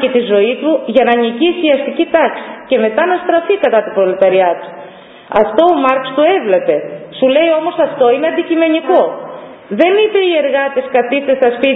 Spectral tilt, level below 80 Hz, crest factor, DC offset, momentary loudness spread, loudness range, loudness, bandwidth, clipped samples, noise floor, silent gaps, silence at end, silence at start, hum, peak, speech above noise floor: -7.5 dB/octave; -58 dBFS; 12 dB; under 0.1%; 6 LU; 1 LU; -12 LUFS; 4 kHz; under 0.1%; -35 dBFS; none; 0 s; 0 s; none; 0 dBFS; 23 dB